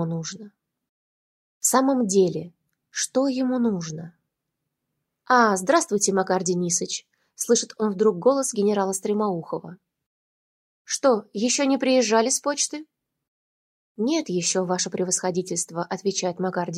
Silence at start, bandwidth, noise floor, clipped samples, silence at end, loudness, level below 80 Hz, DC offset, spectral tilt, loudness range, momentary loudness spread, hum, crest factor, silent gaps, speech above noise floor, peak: 0 s; 16 kHz; -81 dBFS; under 0.1%; 0 s; -23 LUFS; -72 dBFS; under 0.1%; -3.5 dB/octave; 3 LU; 12 LU; none; 20 dB; 0.89-1.61 s, 10.06-10.85 s, 13.28-13.95 s; 58 dB; -6 dBFS